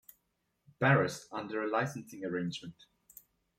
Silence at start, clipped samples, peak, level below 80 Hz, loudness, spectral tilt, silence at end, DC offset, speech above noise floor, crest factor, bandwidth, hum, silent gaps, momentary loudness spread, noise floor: 0.8 s; under 0.1%; -12 dBFS; -74 dBFS; -33 LUFS; -6 dB/octave; 0.85 s; under 0.1%; 47 dB; 22 dB; 15.5 kHz; none; none; 14 LU; -80 dBFS